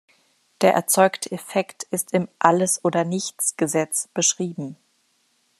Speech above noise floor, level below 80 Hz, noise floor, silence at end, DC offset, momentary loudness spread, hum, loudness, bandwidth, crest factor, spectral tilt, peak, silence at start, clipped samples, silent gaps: 44 dB; -72 dBFS; -66 dBFS; 0.85 s; under 0.1%; 10 LU; none; -21 LUFS; 14 kHz; 22 dB; -3.5 dB/octave; 0 dBFS; 0.6 s; under 0.1%; none